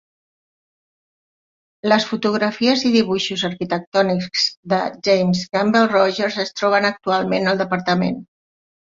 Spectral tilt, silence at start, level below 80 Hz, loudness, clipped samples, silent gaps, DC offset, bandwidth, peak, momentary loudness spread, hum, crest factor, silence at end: -5 dB/octave; 1.85 s; -60 dBFS; -18 LUFS; under 0.1%; 3.87-3.92 s, 4.57-4.63 s; under 0.1%; 7.6 kHz; -2 dBFS; 6 LU; none; 18 dB; 0.75 s